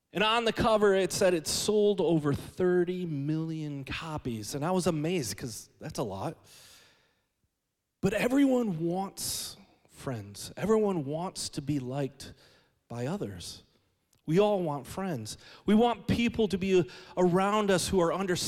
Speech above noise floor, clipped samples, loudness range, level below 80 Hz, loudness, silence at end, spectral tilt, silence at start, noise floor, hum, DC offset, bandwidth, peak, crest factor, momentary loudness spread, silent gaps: 54 dB; under 0.1%; 7 LU; -56 dBFS; -29 LUFS; 0 s; -5 dB/octave; 0.15 s; -83 dBFS; none; under 0.1%; 16.5 kHz; -14 dBFS; 16 dB; 14 LU; none